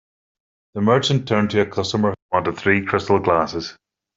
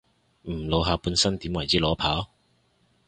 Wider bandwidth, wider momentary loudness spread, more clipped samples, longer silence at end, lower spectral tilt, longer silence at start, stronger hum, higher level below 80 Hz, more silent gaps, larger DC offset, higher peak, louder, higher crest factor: second, 7.8 kHz vs 11 kHz; second, 7 LU vs 13 LU; neither; second, 0.45 s vs 0.85 s; first, -5.5 dB/octave vs -4 dB/octave; first, 0.75 s vs 0.45 s; neither; second, -56 dBFS vs -40 dBFS; first, 2.22-2.29 s vs none; neither; first, -2 dBFS vs -8 dBFS; first, -19 LUFS vs -25 LUFS; about the same, 20 dB vs 20 dB